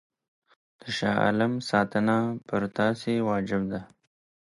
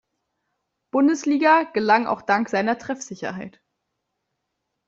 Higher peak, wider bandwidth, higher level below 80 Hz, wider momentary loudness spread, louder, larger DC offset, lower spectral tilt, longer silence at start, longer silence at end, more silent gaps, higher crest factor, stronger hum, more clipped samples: second, -10 dBFS vs -4 dBFS; first, 11.5 kHz vs 7.8 kHz; first, -60 dBFS vs -68 dBFS; second, 9 LU vs 14 LU; second, -27 LUFS vs -21 LUFS; neither; first, -6.5 dB/octave vs -4.5 dB/octave; about the same, 0.85 s vs 0.95 s; second, 0.6 s vs 1.4 s; neither; about the same, 18 dB vs 20 dB; neither; neither